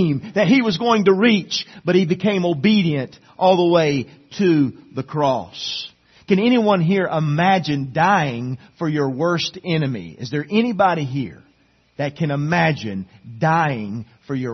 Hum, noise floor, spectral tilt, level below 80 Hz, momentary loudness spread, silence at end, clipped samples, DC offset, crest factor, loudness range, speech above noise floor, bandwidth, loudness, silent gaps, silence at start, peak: none; -58 dBFS; -6.5 dB/octave; -58 dBFS; 13 LU; 0 s; under 0.1%; under 0.1%; 16 dB; 4 LU; 39 dB; 6.4 kHz; -19 LUFS; none; 0 s; -2 dBFS